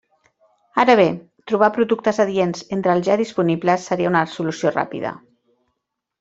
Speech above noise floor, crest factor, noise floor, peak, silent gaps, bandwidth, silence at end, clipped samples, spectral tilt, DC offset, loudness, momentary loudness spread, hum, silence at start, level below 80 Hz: 59 dB; 18 dB; -77 dBFS; -2 dBFS; none; 8 kHz; 1.05 s; under 0.1%; -6 dB/octave; under 0.1%; -19 LUFS; 10 LU; none; 0.75 s; -62 dBFS